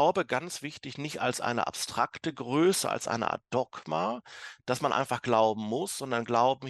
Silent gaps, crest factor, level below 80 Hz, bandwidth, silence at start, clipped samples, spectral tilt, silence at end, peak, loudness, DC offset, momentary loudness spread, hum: none; 20 dB; -70 dBFS; 13 kHz; 0 s; under 0.1%; -4 dB/octave; 0 s; -10 dBFS; -30 LUFS; under 0.1%; 12 LU; none